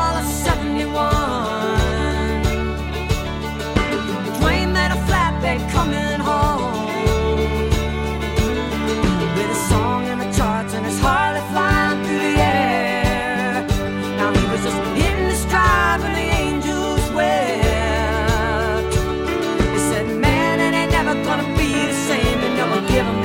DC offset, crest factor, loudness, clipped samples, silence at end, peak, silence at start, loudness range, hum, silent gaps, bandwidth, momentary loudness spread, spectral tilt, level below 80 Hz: under 0.1%; 14 dB; -19 LUFS; under 0.1%; 0 s; -6 dBFS; 0 s; 2 LU; none; none; 17 kHz; 5 LU; -5 dB/octave; -26 dBFS